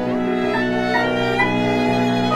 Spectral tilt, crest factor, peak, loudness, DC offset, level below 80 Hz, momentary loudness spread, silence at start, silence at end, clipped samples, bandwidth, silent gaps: -6 dB/octave; 14 dB; -6 dBFS; -19 LUFS; under 0.1%; -44 dBFS; 2 LU; 0 s; 0 s; under 0.1%; 13.5 kHz; none